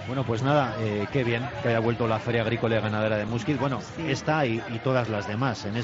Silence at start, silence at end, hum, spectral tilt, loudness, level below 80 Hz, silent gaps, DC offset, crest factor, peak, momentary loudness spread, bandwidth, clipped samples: 0 s; 0 s; none; -6.5 dB/octave; -26 LUFS; -56 dBFS; none; under 0.1%; 16 dB; -10 dBFS; 4 LU; 7.8 kHz; under 0.1%